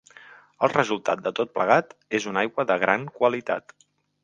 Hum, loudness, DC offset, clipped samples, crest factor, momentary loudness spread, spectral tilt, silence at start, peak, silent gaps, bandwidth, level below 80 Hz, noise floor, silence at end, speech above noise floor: none; -24 LUFS; under 0.1%; under 0.1%; 24 dB; 7 LU; -5 dB/octave; 0.6 s; -2 dBFS; none; 9.2 kHz; -72 dBFS; -50 dBFS; 0.65 s; 26 dB